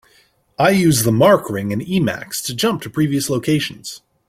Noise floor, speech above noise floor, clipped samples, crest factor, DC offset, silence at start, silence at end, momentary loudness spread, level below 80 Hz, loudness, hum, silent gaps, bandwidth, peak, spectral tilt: -56 dBFS; 39 dB; under 0.1%; 16 dB; under 0.1%; 0.6 s; 0.3 s; 11 LU; -52 dBFS; -17 LUFS; none; none; 16.5 kHz; -2 dBFS; -5 dB/octave